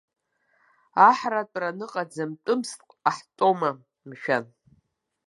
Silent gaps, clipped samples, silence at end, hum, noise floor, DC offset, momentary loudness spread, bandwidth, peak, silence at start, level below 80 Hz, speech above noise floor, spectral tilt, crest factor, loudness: none; under 0.1%; 0.85 s; none; -71 dBFS; under 0.1%; 15 LU; 11.5 kHz; -4 dBFS; 0.95 s; -80 dBFS; 47 dB; -4.5 dB/octave; 24 dB; -25 LUFS